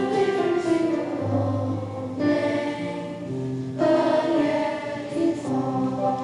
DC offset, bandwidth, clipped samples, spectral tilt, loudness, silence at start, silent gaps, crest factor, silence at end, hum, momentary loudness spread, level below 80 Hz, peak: under 0.1%; 11 kHz; under 0.1%; -7 dB/octave; -24 LUFS; 0 s; none; 14 dB; 0 s; none; 9 LU; -60 dBFS; -10 dBFS